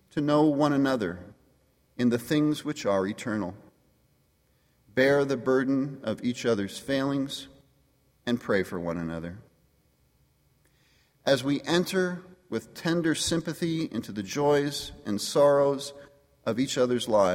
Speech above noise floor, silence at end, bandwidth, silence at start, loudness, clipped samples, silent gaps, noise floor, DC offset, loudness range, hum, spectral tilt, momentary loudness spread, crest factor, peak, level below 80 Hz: 41 dB; 0 s; 16.5 kHz; 0.15 s; -27 LUFS; under 0.1%; none; -67 dBFS; under 0.1%; 6 LU; none; -5 dB/octave; 13 LU; 18 dB; -8 dBFS; -60 dBFS